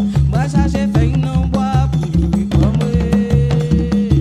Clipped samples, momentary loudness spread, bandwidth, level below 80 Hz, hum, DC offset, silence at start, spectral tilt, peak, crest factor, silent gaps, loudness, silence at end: under 0.1%; 2 LU; 10.5 kHz; -22 dBFS; none; under 0.1%; 0 s; -8 dB/octave; 0 dBFS; 12 dB; none; -15 LUFS; 0 s